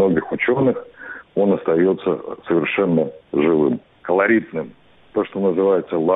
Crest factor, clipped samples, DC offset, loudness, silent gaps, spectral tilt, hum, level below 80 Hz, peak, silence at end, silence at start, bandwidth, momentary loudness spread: 14 dB; under 0.1%; under 0.1%; -19 LUFS; none; -11 dB/octave; none; -58 dBFS; -4 dBFS; 0 s; 0 s; 4 kHz; 11 LU